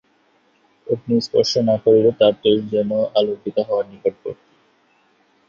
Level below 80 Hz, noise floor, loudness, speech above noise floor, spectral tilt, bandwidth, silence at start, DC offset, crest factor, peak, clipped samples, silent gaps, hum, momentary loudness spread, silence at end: -58 dBFS; -60 dBFS; -18 LUFS; 42 dB; -6 dB/octave; 7.2 kHz; 0.85 s; under 0.1%; 18 dB; -2 dBFS; under 0.1%; none; none; 13 LU; 1.15 s